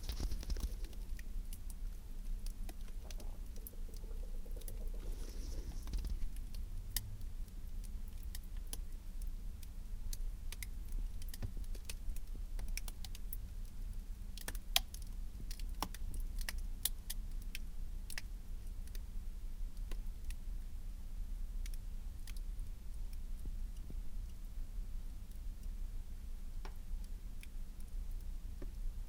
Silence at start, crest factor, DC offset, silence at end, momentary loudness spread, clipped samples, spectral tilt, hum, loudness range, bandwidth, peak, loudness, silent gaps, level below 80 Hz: 0 s; 30 dB; under 0.1%; 0 s; 7 LU; under 0.1%; -3 dB/octave; none; 7 LU; 18 kHz; -12 dBFS; -48 LUFS; none; -42 dBFS